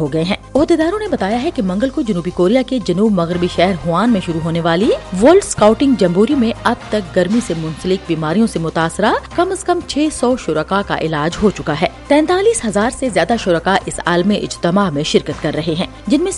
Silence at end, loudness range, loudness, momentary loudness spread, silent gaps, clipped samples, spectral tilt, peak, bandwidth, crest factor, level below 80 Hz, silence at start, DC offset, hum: 0 s; 3 LU; -15 LUFS; 6 LU; none; under 0.1%; -5.5 dB/octave; 0 dBFS; 11.5 kHz; 14 dB; -38 dBFS; 0 s; under 0.1%; none